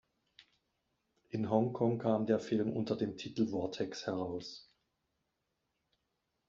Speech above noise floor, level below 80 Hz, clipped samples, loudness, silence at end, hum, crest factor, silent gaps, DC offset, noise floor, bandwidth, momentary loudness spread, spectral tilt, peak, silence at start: 50 dB; -74 dBFS; under 0.1%; -35 LUFS; 1.85 s; none; 22 dB; none; under 0.1%; -84 dBFS; 7.6 kHz; 11 LU; -6.5 dB/octave; -16 dBFS; 1.35 s